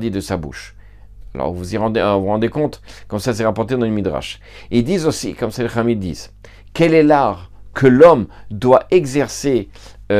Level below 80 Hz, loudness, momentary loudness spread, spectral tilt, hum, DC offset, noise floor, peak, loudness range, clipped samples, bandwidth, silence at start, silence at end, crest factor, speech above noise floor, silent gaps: -42 dBFS; -16 LUFS; 19 LU; -6 dB/octave; 50 Hz at -40 dBFS; under 0.1%; -38 dBFS; 0 dBFS; 7 LU; under 0.1%; 15 kHz; 0 s; 0 s; 16 dB; 22 dB; none